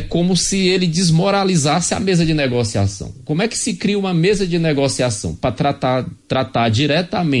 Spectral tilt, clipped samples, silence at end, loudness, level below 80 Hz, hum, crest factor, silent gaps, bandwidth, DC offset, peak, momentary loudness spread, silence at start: -5 dB/octave; under 0.1%; 0 s; -17 LUFS; -40 dBFS; none; 12 dB; none; 11.5 kHz; under 0.1%; -4 dBFS; 6 LU; 0 s